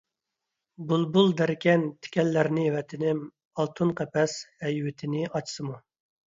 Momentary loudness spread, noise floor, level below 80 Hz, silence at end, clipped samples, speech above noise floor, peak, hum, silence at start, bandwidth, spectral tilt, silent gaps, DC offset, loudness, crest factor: 12 LU; -85 dBFS; -68 dBFS; 0.55 s; under 0.1%; 59 dB; -8 dBFS; none; 0.8 s; 7.8 kHz; -6 dB/octave; 3.45-3.51 s; under 0.1%; -27 LUFS; 20 dB